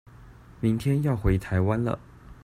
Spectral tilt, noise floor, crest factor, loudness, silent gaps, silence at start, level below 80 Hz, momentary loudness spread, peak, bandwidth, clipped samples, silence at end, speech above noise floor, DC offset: -8.5 dB/octave; -49 dBFS; 16 dB; -26 LUFS; none; 0.2 s; -38 dBFS; 5 LU; -10 dBFS; 15 kHz; under 0.1%; 0.1 s; 24 dB; under 0.1%